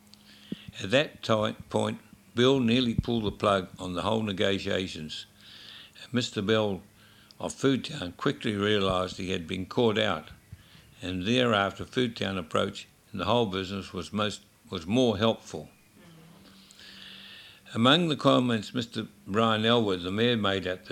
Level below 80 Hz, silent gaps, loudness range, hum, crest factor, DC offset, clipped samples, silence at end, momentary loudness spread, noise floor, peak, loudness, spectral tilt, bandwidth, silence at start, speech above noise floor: -56 dBFS; none; 5 LU; none; 22 dB; under 0.1%; under 0.1%; 0 s; 19 LU; -56 dBFS; -6 dBFS; -28 LUFS; -5.5 dB/octave; 15 kHz; 0.5 s; 28 dB